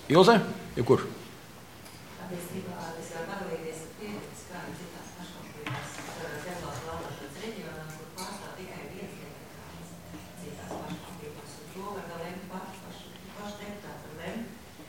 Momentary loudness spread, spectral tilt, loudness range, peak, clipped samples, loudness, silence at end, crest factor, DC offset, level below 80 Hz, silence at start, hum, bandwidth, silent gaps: 17 LU; -5.5 dB/octave; 8 LU; -4 dBFS; under 0.1%; -34 LUFS; 0 s; 28 dB; 0.1%; -60 dBFS; 0 s; none; 17 kHz; none